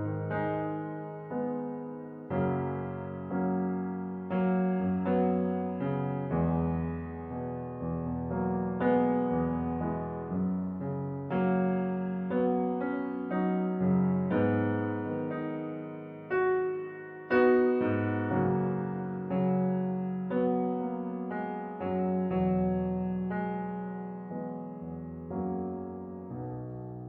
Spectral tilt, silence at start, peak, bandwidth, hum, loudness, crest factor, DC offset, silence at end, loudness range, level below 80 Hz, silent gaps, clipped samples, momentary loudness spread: -8.5 dB/octave; 0 s; -14 dBFS; 4.4 kHz; none; -31 LUFS; 18 dB; under 0.1%; 0 s; 5 LU; -56 dBFS; none; under 0.1%; 11 LU